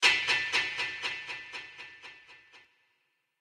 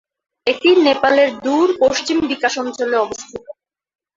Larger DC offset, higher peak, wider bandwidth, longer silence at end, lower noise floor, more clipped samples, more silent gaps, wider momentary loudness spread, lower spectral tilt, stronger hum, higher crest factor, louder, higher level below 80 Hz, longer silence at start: neither; second, -10 dBFS vs -2 dBFS; first, 16 kHz vs 7.8 kHz; first, 0.8 s vs 0.65 s; first, -76 dBFS vs -40 dBFS; neither; neither; first, 20 LU vs 11 LU; second, 0.5 dB/octave vs -3 dB/octave; neither; first, 24 dB vs 16 dB; second, -30 LUFS vs -16 LUFS; second, -72 dBFS vs -56 dBFS; second, 0 s vs 0.45 s